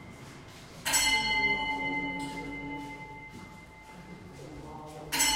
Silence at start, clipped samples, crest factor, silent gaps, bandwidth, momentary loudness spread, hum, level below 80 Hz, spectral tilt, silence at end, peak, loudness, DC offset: 0 s; under 0.1%; 20 dB; none; 16 kHz; 23 LU; none; -54 dBFS; -1 dB/octave; 0 s; -14 dBFS; -29 LUFS; under 0.1%